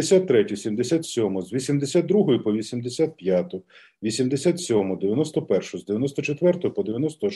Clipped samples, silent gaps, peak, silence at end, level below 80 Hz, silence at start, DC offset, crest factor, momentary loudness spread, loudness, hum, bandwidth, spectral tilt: under 0.1%; none; -6 dBFS; 0 s; -66 dBFS; 0 s; under 0.1%; 16 dB; 7 LU; -23 LUFS; none; 12 kHz; -6 dB/octave